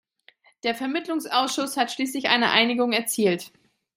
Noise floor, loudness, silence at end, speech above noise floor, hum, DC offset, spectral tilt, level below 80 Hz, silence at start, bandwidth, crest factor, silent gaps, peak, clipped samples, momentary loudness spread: -58 dBFS; -23 LUFS; 0.5 s; 35 dB; none; under 0.1%; -2.5 dB/octave; -74 dBFS; 0.65 s; 16 kHz; 22 dB; none; -2 dBFS; under 0.1%; 10 LU